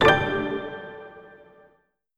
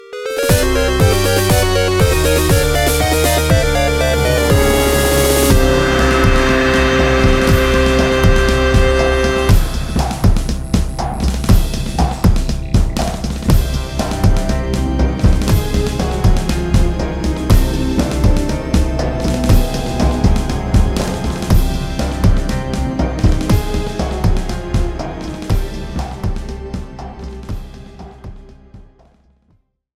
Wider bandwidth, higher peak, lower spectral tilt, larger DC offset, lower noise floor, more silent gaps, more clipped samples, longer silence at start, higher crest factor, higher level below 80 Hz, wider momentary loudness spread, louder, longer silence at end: second, 14.5 kHz vs 17 kHz; about the same, -2 dBFS vs 0 dBFS; about the same, -5.5 dB/octave vs -5.5 dB/octave; neither; first, -65 dBFS vs -58 dBFS; neither; neither; about the same, 0 s vs 0.05 s; first, 24 dB vs 14 dB; second, -48 dBFS vs -18 dBFS; first, 24 LU vs 10 LU; second, -25 LUFS vs -15 LUFS; second, 0.95 s vs 1.15 s